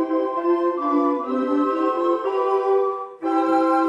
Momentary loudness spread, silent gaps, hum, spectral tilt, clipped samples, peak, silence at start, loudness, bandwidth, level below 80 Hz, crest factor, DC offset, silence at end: 3 LU; none; none; -5.5 dB/octave; under 0.1%; -8 dBFS; 0 s; -21 LUFS; 9.6 kHz; -72 dBFS; 12 dB; under 0.1%; 0 s